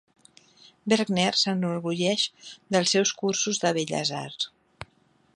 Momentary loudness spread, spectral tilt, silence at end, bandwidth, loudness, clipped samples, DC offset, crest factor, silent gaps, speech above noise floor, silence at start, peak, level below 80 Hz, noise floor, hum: 20 LU; -3.5 dB/octave; 0.5 s; 11 kHz; -25 LUFS; under 0.1%; under 0.1%; 20 dB; none; 38 dB; 0.85 s; -8 dBFS; -66 dBFS; -64 dBFS; none